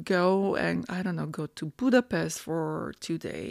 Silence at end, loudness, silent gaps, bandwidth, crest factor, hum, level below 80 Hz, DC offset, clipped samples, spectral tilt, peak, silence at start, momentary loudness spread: 0 s; -29 LUFS; none; 15 kHz; 18 dB; none; -62 dBFS; under 0.1%; under 0.1%; -5.5 dB/octave; -10 dBFS; 0 s; 10 LU